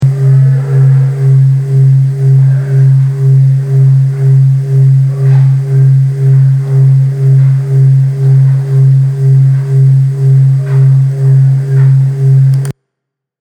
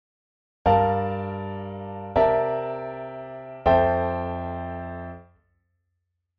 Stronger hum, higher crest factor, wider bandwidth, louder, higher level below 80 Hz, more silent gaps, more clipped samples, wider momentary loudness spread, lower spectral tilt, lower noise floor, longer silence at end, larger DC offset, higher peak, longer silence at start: neither; second, 6 dB vs 20 dB; second, 2.3 kHz vs 5.8 kHz; first, -8 LUFS vs -25 LUFS; second, -50 dBFS vs -44 dBFS; neither; neither; second, 2 LU vs 16 LU; first, -10 dB/octave vs -6 dB/octave; about the same, -75 dBFS vs -78 dBFS; second, 0.7 s vs 1.15 s; neither; first, 0 dBFS vs -6 dBFS; second, 0 s vs 0.65 s